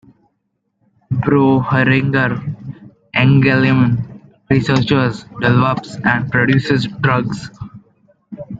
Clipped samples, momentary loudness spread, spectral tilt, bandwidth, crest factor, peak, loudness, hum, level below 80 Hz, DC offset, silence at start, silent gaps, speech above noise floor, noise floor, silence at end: under 0.1%; 16 LU; -7.5 dB/octave; 7.8 kHz; 16 dB; 0 dBFS; -15 LUFS; none; -46 dBFS; under 0.1%; 1.1 s; none; 55 dB; -69 dBFS; 0 s